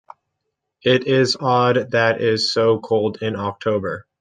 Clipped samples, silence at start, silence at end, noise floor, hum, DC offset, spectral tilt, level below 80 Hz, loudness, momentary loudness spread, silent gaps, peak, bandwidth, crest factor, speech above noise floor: under 0.1%; 0.85 s; 0.2 s; -77 dBFS; none; under 0.1%; -5 dB/octave; -64 dBFS; -19 LUFS; 7 LU; none; -2 dBFS; 9.6 kHz; 18 dB; 59 dB